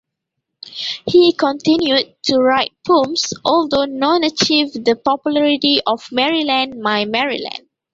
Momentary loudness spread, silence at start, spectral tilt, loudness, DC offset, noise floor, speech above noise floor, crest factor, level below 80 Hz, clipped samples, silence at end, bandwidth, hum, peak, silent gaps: 7 LU; 0.65 s; -3.5 dB/octave; -16 LUFS; under 0.1%; -78 dBFS; 62 dB; 16 dB; -56 dBFS; under 0.1%; 0.35 s; 7.8 kHz; none; 0 dBFS; none